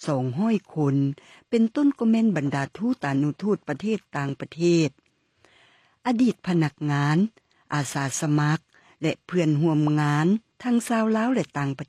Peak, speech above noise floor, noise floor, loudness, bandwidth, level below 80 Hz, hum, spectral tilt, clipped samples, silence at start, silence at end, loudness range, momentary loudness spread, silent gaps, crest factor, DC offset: -10 dBFS; 40 dB; -63 dBFS; -24 LUFS; 13.5 kHz; -68 dBFS; none; -6.5 dB/octave; under 0.1%; 0 s; 0.05 s; 3 LU; 7 LU; none; 14 dB; under 0.1%